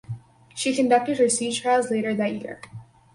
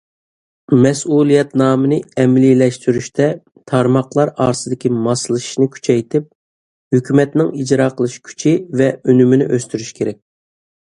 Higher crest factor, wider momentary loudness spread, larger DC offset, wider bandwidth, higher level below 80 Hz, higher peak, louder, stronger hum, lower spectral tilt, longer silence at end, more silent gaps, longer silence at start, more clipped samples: about the same, 16 dB vs 14 dB; first, 19 LU vs 9 LU; neither; about the same, 11.5 kHz vs 11 kHz; second, -64 dBFS vs -54 dBFS; second, -8 dBFS vs 0 dBFS; second, -22 LUFS vs -15 LUFS; neither; second, -3.5 dB/octave vs -6.5 dB/octave; second, 0.3 s vs 0.8 s; second, none vs 6.35-6.91 s; second, 0.1 s vs 0.7 s; neither